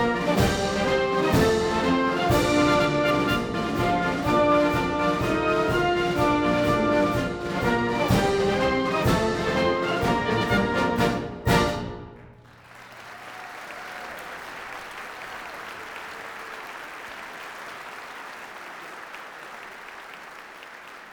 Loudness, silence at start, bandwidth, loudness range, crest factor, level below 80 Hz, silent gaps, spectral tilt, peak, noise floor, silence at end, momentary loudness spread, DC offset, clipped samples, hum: -23 LUFS; 0 s; over 20 kHz; 16 LU; 18 dB; -44 dBFS; none; -5.5 dB/octave; -6 dBFS; -48 dBFS; 0 s; 18 LU; under 0.1%; under 0.1%; none